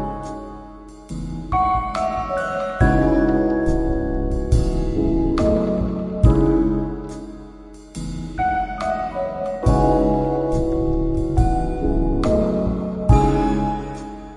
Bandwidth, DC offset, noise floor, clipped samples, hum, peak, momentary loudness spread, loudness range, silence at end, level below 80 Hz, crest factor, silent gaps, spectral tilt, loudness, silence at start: 11 kHz; under 0.1%; -40 dBFS; under 0.1%; none; -2 dBFS; 15 LU; 3 LU; 0 s; -26 dBFS; 18 dB; none; -8 dB/octave; -20 LUFS; 0 s